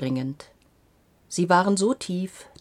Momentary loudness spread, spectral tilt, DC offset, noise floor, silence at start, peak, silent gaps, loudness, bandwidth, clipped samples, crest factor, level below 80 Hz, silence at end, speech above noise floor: 15 LU; -5 dB/octave; under 0.1%; -61 dBFS; 0 s; -4 dBFS; none; -24 LUFS; 14 kHz; under 0.1%; 22 dB; -64 dBFS; 0.15 s; 37 dB